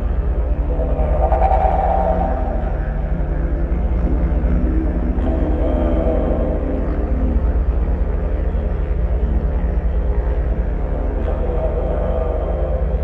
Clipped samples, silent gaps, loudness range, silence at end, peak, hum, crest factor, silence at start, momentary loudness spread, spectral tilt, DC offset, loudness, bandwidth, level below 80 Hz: under 0.1%; none; 2 LU; 0 s; -2 dBFS; none; 16 dB; 0 s; 5 LU; -11 dB/octave; under 0.1%; -20 LUFS; 3.5 kHz; -18 dBFS